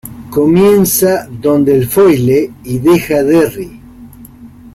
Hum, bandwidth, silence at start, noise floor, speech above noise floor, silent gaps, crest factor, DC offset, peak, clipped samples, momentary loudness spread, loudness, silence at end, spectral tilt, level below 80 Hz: none; 16.5 kHz; 0.05 s; -35 dBFS; 25 dB; none; 10 dB; under 0.1%; 0 dBFS; under 0.1%; 9 LU; -10 LUFS; 0.05 s; -6 dB/octave; -42 dBFS